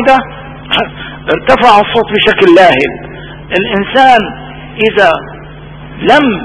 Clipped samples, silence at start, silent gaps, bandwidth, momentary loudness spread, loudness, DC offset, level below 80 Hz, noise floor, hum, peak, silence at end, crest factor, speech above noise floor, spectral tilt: 3%; 0 s; none; 11 kHz; 21 LU; -8 LUFS; under 0.1%; -36 dBFS; -28 dBFS; none; 0 dBFS; 0 s; 10 dB; 21 dB; -5.5 dB/octave